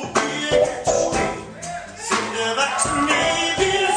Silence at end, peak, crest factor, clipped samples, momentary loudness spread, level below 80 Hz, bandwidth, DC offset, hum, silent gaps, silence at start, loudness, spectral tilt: 0 s; -6 dBFS; 16 dB; under 0.1%; 13 LU; -44 dBFS; 10.5 kHz; under 0.1%; none; none; 0 s; -20 LUFS; -2.5 dB/octave